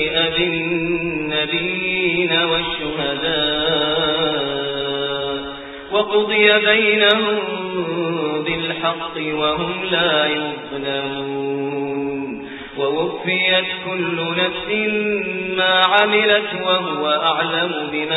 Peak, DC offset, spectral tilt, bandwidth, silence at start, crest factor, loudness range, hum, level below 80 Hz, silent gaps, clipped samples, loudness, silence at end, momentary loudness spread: 0 dBFS; under 0.1%; -7 dB/octave; 4.1 kHz; 0 s; 20 dB; 4 LU; none; -50 dBFS; none; under 0.1%; -18 LUFS; 0 s; 10 LU